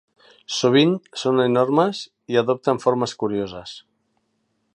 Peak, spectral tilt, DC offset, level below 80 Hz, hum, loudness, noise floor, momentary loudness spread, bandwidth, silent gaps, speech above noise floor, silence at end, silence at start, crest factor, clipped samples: -4 dBFS; -5.5 dB/octave; under 0.1%; -62 dBFS; none; -20 LUFS; -70 dBFS; 15 LU; 10.5 kHz; none; 50 dB; 0.95 s; 0.5 s; 18 dB; under 0.1%